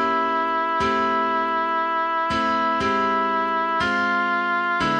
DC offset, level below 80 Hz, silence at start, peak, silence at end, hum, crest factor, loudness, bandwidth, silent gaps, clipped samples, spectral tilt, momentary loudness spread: under 0.1%; -52 dBFS; 0 s; -10 dBFS; 0 s; none; 12 dB; -21 LUFS; 9.8 kHz; none; under 0.1%; -4.5 dB/octave; 1 LU